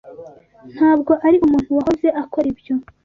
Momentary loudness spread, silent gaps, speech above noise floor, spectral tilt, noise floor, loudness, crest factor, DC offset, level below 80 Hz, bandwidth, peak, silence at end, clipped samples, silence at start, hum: 8 LU; none; 24 dB; -8 dB/octave; -40 dBFS; -17 LUFS; 14 dB; under 0.1%; -48 dBFS; 7 kHz; -4 dBFS; 0.25 s; under 0.1%; 0.05 s; none